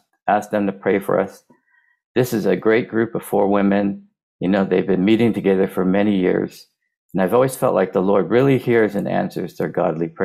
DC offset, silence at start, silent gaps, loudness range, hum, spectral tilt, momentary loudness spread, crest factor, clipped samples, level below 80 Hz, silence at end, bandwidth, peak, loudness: under 0.1%; 0.25 s; 2.05-2.15 s, 4.23-4.39 s, 6.97-7.09 s; 2 LU; none; -7 dB/octave; 8 LU; 14 dB; under 0.1%; -58 dBFS; 0 s; 15.5 kHz; -4 dBFS; -19 LUFS